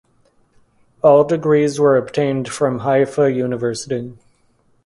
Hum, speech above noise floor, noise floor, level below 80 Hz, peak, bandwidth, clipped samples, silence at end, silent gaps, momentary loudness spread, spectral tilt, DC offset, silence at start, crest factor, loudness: none; 43 dB; -59 dBFS; -58 dBFS; 0 dBFS; 11.5 kHz; under 0.1%; 0.7 s; none; 11 LU; -6.5 dB/octave; under 0.1%; 1.05 s; 18 dB; -17 LUFS